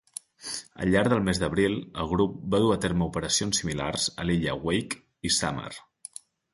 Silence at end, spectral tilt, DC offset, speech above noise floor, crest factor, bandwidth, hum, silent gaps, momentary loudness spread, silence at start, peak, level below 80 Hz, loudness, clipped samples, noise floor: 0.75 s; -4 dB/octave; under 0.1%; 21 dB; 18 dB; 12 kHz; none; none; 16 LU; 0.4 s; -10 dBFS; -46 dBFS; -27 LUFS; under 0.1%; -47 dBFS